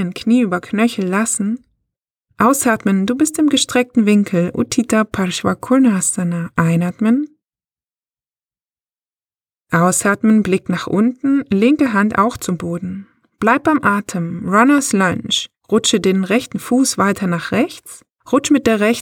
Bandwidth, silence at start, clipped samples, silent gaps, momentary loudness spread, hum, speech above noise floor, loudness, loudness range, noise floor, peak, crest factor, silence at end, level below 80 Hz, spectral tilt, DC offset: 17.5 kHz; 0 s; under 0.1%; none; 6 LU; none; over 75 dB; -16 LUFS; 4 LU; under -90 dBFS; -2 dBFS; 16 dB; 0 s; -52 dBFS; -4.5 dB/octave; under 0.1%